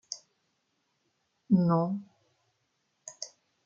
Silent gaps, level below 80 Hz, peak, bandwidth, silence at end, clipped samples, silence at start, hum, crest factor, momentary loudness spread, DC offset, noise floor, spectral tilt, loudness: none; -74 dBFS; -12 dBFS; 7.8 kHz; 0.4 s; under 0.1%; 0.1 s; none; 20 dB; 21 LU; under 0.1%; -77 dBFS; -7 dB/octave; -28 LUFS